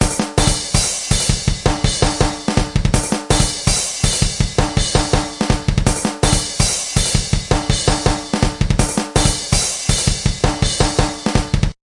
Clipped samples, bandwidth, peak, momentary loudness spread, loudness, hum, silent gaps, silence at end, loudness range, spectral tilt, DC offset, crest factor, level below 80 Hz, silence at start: under 0.1%; 11.5 kHz; 0 dBFS; 3 LU; -17 LUFS; none; none; 0.2 s; 0 LU; -3.5 dB/octave; under 0.1%; 16 dB; -22 dBFS; 0 s